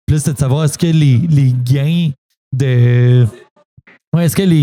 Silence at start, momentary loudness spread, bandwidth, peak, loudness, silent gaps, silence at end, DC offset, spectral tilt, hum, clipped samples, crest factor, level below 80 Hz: 0.1 s; 8 LU; 15.5 kHz; 0 dBFS; -13 LUFS; 2.18-2.29 s, 2.37-2.51 s, 3.50-3.56 s, 3.65-3.77 s, 4.07-4.12 s; 0 s; under 0.1%; -7 dB/octave; none; under 0.1%; 12 dB; -40 dBFS